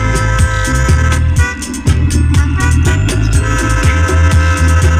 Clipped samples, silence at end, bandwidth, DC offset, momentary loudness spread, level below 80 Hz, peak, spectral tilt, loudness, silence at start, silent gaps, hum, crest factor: under 0.1%; 0 s; 14.5 kHz; under 0.1%; 3 LU; -14 dBFS; 0 dBFS; -5.5 dB/octave; -12 LUFS; 0 s; none; none; 10 dB